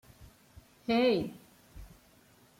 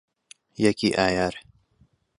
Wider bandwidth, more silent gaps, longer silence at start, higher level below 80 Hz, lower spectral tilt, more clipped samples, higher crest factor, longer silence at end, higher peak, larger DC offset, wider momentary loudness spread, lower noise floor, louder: first, 16.5 kHz vs 11.5 kHz; neither; second, 0.2 s vs 0.6 s; second, -60 dBFS vs -52 dBFS; about the same, -6 dB/octave vs -5 dB/octave; neither; about the same, 18 dB vs 22 dB; about the same, 0.75 s vs 0.8 s; second, -18 dBFS vs -6 dBFS; neither; first, 27 LU vs 20 LU; about the same, -62 dBFS vs -63 dBFS; second, -30 LUFS vs -23 LUFS